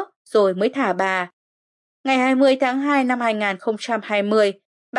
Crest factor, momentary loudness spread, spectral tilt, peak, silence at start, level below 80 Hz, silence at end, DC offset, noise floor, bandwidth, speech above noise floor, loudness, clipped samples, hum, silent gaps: 14 dB; 8 LU; -5 dB/octave; -6 dBFS; 0 s; -80 dBFS; 0 s; under 0.1%; under -90 dBFS; 11 kHz; over 71 dB; -20 LUFS; under 0.1%; none; 0.16-0.25 s, 1.33-2.04 s, 4.65-4.93 s